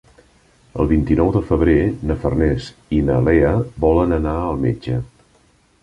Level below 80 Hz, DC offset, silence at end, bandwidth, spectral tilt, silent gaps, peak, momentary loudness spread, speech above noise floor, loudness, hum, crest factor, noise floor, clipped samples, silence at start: -28 dBFS; under 0.1%; 0.8 s; 10.5 kHz; -9 dB/octave; none; -2 dBFS; 9 LU; 39 dB; -18 LUFS; none; 16 dB; -56 dBFS; under 0.1%; 0.75 s